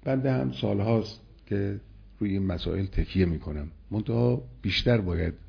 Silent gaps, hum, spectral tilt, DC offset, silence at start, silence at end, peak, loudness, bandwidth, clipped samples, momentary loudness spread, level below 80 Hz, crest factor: none; none; -8 dB/octave; under 0.1%; 0 s; 0.05 s; -10 dBFS; -28 LUFS; 5.4 kHz; under 0.1%; 9 LU; -40 dBFS; 16 dB